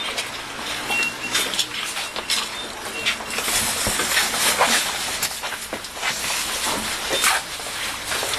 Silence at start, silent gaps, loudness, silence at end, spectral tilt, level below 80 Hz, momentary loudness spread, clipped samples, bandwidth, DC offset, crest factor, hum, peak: 0 s; none; -22 LUFS; 0 s; 0 dB/octave; -48 dBFS; 10 LU; under 0.1%; 14 kHz; under 0.1%; 20 dB; none; -4 dBFS